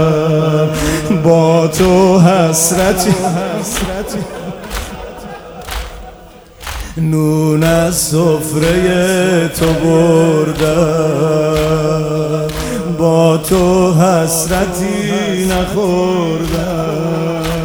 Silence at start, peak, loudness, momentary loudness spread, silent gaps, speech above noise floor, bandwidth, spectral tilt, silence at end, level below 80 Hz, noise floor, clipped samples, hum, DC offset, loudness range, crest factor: 0 s; 0 dBFS; -13 LUFS; 14 LU; none; 25 dB; over 20 kHz; -5.5 dB/octave; 0 s; -30 dBFS; -36 dBFS; under 0.1%; none; under 0.1%; 8 LU; 12 dB